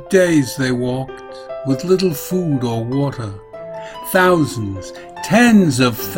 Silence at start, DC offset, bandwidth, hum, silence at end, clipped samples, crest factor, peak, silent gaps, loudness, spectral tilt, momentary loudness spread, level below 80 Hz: 0 s; under 0.1%; 16.5 kHz; none; 0 s; under 0.1%; 16 dB; 0 dBFS; none; -16 LUFS; -5.5 dB/octave; 18 LU; -46 dBFS